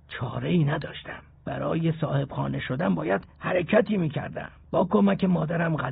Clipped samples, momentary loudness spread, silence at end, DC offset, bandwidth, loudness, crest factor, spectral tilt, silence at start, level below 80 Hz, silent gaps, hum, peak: under 0.1%; 14 LU; 0 s; under 0.1%; 4.6 kHz; -26 LUFS; 18 dB; -6.5 dB/octave; 0.1 s; -52 dBFS; none; none; -8 dBFS